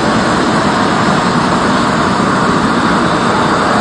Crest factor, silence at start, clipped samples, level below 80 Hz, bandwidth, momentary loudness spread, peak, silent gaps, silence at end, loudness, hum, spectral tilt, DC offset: 10 dB; 0 s; under 0.1%; -36 dBFS; 11 kHz; 0 LU; 0 dBFS; none; 0 s; -11 LUFS; none; -5 dB/octave; under 0.1%